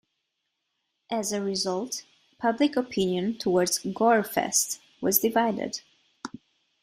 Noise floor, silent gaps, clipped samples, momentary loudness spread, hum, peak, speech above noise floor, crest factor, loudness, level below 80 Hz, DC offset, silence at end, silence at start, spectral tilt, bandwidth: -80 dBFS; none; under 0.1%; 13 LU; none; -8 dBFS; 54 dB; 20 dB; -26 LUFS; -66 dBFS; under 0.1%; 0.55 s; 1.1 s; -3.5 dB/octave; 16 kHz